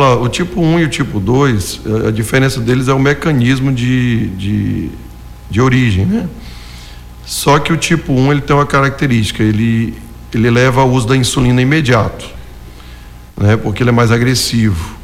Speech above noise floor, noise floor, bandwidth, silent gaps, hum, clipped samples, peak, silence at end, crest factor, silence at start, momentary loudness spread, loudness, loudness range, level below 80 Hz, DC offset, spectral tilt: 21 dB; -32 dBFS; 16 kHz; none; 60 Hz at -30 dBFS; under 0.1%; -2 dBFS; 0 s; 12 dB; 0 s; 15 LU; -12 LUFS; 3 LU; -32 dBFS; under 0.1%; -6 dB/octave